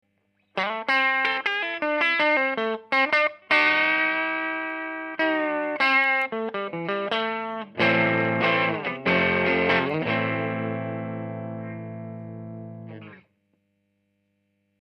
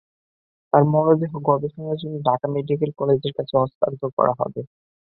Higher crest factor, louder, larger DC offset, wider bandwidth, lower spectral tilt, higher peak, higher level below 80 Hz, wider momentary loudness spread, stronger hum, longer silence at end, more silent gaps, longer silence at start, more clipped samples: about the same, 18 dB vs 20 dB; about the same, -23 LUFS vs -21 LUFS; neither; first, 9.8 kHz vs 4.5 kHz; second, -6 dB/octave vs -12.5 dB/octave; second, -6 dBFS vs -2 dBFS; about the same, -66 dBFS vs -62 dBFS; first, 16 LU vs 10 LU; first, 50 Hz at -65 dBFS vs none; first, 1.6 s vs 0.4 s; second, none vs 3.75-3.81 s, 4.13-4.17 s; second, 0.55 s vs 0.75 s; neither